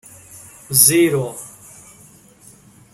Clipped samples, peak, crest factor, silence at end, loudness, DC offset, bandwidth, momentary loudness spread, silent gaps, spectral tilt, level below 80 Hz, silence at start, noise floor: under 0.1%; 0 dBFS; 20 dB; 1.45 s; -13 LUFS; under 0.1%; 16.5 kHz; 23 LU; none; -3 dB/octave; -58 dBFS; 0.35 s; -47 dBFS